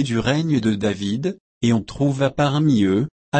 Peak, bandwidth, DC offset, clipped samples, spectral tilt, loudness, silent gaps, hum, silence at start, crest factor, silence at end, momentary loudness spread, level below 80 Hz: -6 dBFS; 8.8 kHz; under 0.1%; under 0.1%; -6.5 dB/octave; -20 LUFS; 1.40-1.61 s, 3.11-3.32 s; none; 0 s; 12 dB; 0 s; 6 LU; -48 dBFS